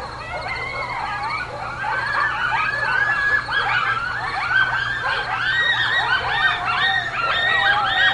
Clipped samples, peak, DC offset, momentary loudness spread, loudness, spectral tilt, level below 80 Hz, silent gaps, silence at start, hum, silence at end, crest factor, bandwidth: under 0.1%; -6 dBFS; under 0.1%; 9 LU; -19 LUFS; -3 dB/octave; -46 dBFS; none; 0 s; none; 0 s; 16 dB; 11.5 kHz